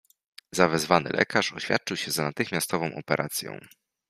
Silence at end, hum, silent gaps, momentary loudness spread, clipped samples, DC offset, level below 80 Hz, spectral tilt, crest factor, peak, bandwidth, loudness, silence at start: 0.45 s; none; none; 9 LU; under 0.1%; under 0.1%; -64 dBFS; -3.5 dB/octave; 26 dB; -2 dBFS; 15.5 kHz; -26 LUFS; 0.55 s